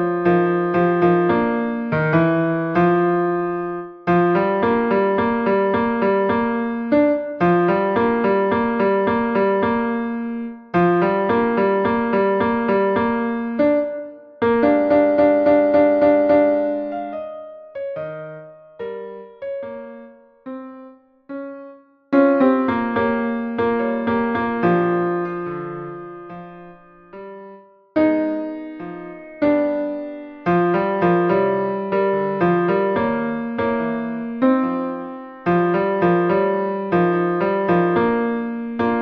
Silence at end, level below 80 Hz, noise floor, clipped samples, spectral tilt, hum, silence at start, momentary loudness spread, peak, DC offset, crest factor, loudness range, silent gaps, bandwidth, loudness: 0 s; -54 dBFS; -44 dBFS; under 0.1%; -10 dB/octave; none; 0 s; 17 LU; -2 dBFS; under 0.1%; 16 dB; 9 LU; none; 5.2 kHz; -19 LUFS